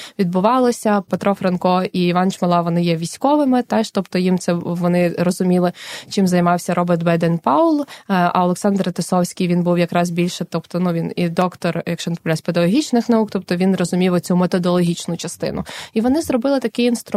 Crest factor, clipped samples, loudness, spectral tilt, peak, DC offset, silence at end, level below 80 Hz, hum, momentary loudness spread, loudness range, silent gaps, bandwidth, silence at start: 16 dB; under 0.1%; -18 LUFS; -6.5 dB/octave; 0 dBFS; under 0.1%; 0 s; -56 dBFS; none; 6 LU; 2 LU; none; 14.5 kHz; 0 s